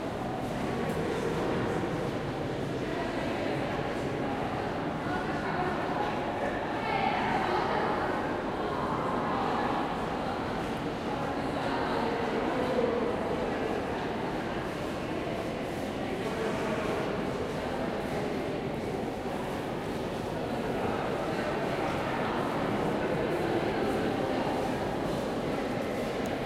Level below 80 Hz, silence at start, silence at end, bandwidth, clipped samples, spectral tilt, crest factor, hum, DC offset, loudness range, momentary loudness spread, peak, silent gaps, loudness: -50 dBFS; 0 s; 0 s; 16 kHz; under 0.1%; -6 dB/octave; 14 dB; none; under 0.1%; 3 LU; 4 LU; -16 dBFS; none; -31 LUFS